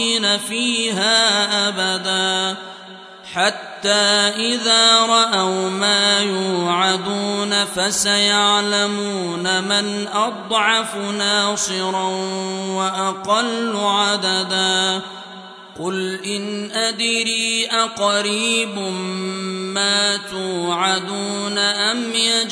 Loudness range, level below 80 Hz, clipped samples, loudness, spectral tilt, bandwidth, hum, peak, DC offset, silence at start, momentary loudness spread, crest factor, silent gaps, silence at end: 5 LU; -66 dBFS; under 0.1%; -17 LUFS; -2 dB/octave; 11 kHz; none; -2 dBFS; under 0.1%; 0 s; 10 LU; 18 dB; none; 0 s